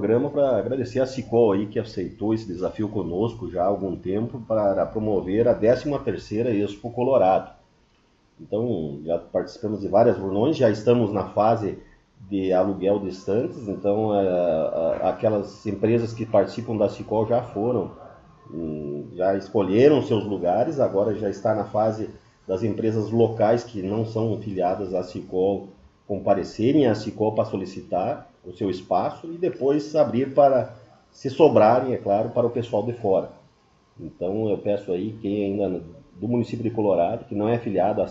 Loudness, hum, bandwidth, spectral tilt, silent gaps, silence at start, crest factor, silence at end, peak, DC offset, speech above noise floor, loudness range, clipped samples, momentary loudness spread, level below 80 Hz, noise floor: -23 LUFS; none; 7.8 kHz; -8 dB/octave; none; 0 s; 20 dB; 0 s; -2 dBFS; under 0.1%; 39 dB; 4 LU; under 0.1%; 10 LU; -54 dBFS; -61 dBFS